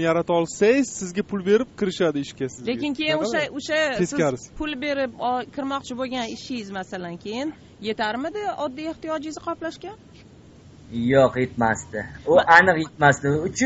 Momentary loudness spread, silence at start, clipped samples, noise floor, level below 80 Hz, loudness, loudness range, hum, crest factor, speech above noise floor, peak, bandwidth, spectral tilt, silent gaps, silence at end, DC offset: 13 LU; 0 s; under 0.1%; -48 dBFS; -52 dBFS; -23 LUFS; 10 LU; none; 22 dB; 25 dB; -2 dBFS; 8 kHz; -3.5 dB/octave; none; 0 s; under 0.1%